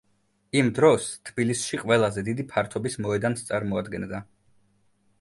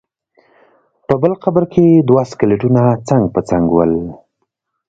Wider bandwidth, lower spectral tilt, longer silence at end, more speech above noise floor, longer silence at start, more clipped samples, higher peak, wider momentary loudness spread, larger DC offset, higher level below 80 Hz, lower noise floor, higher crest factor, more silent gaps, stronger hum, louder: first, 11.5 kHz vs 7.8 kHz; second, -5 dB/octave vs -9 dB/octave; first, 1 s vs 0.75 s; second, 43 dB vs 58 dB; second, 0.55 s vs 1.1 s; neither; second, -6 dBFS vs 0 dBFS; first, 12 LU vs 6 LU; neither; second, -56 dBFS vs -44 dBFS; about the same, -68 dBFS vs -71 dBFS; first, 20 dB vs 14 dB; neither; neither; second, -25 LUFS vs -13 LUFS